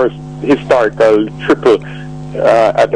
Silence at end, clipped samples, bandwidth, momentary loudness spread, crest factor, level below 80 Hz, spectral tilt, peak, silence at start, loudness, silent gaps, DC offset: 0 s; under 0.1%; 10 kHz; 13 LU; 10 dB; -42 dBFS; -6.5 dB/octave; -2 dBFS; 0 s; -12 LUFS; none; 0.7%